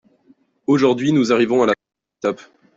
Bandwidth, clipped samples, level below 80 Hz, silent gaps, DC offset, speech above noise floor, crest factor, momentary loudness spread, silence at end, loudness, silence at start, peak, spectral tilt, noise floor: 7.8 kHz; under 0.1%; -62 dBFS; none; under 0.1%; 40 dB; 16 dB; 10 LU; 0.4 s; -18 LUFS; 0.7 s; -4 dBFS; -6 dB/octave; -56 dBFS